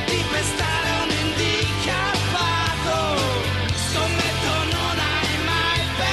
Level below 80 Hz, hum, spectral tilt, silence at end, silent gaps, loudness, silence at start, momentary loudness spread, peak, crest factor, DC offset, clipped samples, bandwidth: -36 dBFS; none; -3.5 dB/octave; 0 s; none; -21 LUFS; 0 s; 2 LU; -8 dBFS; 14 dB; under 0.1%; under 0.1%; 13 kHz